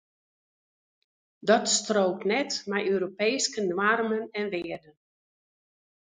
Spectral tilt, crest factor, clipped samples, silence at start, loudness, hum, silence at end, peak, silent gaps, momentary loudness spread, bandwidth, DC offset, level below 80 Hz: -3 dB/octave; 22 dB; under 0.1%; 1.45 s; -26 LUFS; none; 1.35 s; -8 dBFS; none; 9 LU; 9.6 kHz; under 0.1%; -74 dBFS